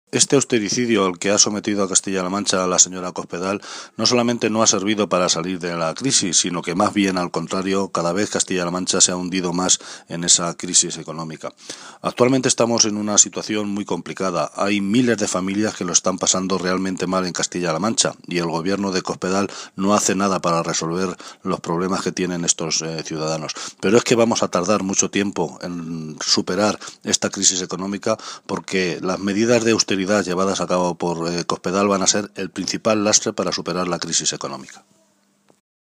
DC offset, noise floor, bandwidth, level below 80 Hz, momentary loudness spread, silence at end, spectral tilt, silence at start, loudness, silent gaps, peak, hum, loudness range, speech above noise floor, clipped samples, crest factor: under 0.1%; -61 dBFS; 15.5 kHz; -62 dBFS; 11 LU; 1.15 s; -3 dB/octave; 0.15 s; -19 LUFS; none; 0 dBFS; none; 3 LU; 41 dB; under 0.1%; 20 dB